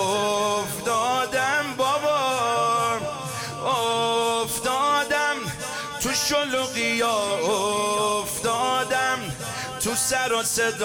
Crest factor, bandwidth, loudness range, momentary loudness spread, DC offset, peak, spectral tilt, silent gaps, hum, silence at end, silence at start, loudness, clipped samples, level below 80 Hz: 12 dB; 18 kHz; 1 LU; 6 LU; under 0.1%; -12 dBFS; -2 dB/octave; none; none; 0 s; 0 s; -23 LUFS; under 0.1%; -56 dBFS